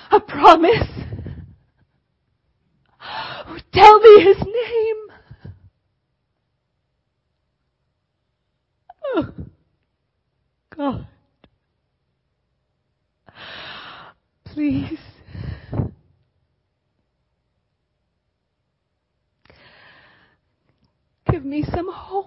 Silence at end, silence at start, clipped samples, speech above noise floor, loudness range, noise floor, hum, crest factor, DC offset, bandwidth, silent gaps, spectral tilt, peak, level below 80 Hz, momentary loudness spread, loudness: 0.05 s; 0.1 s; under 0.1%; 60 dB; 21 LU; -73 dBFS; none; 20 dB; under 0.1%; 7.4 kHz; none; -6.5 dB/octave; 0 dBFS; -44 dBFS; 26 LU; -15 LUFS